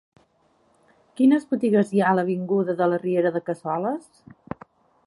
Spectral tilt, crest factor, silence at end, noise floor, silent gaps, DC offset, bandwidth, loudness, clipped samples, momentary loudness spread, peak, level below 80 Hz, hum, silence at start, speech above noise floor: -8 dB/octave; 18 dB; 1.1 s; -63 dBFS; none; under 0.1%; 11.5 kHz; -22 LUFS; under 0.1%; 18 LU; -6 dBFS; -68 dBFS; none; 1.15 s; 42 dB